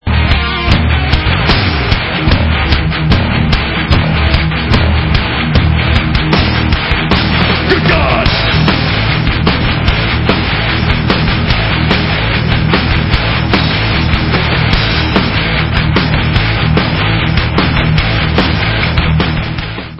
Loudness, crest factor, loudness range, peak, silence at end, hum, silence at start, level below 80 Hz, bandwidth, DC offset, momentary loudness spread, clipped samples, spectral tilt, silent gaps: -11 LUFS; 10 dB; 1 LU; 0 dBFS; 0 s; none; 0.05 s; -18 dBFS; 8 kHz; under 0.1%; 2 LU; 0.1%; -7.5 dB/octave; none